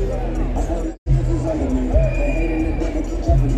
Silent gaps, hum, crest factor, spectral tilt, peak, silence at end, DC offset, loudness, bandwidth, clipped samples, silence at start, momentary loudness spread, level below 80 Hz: 0.98-1.06 s; none; 14 dB; -8 dB/octave; -4 dBFS; 0 s; under 0.1%; -21 LUFS; 8.4 kHz; under 0.1%; 0 s; 5 LU; -20 dBFS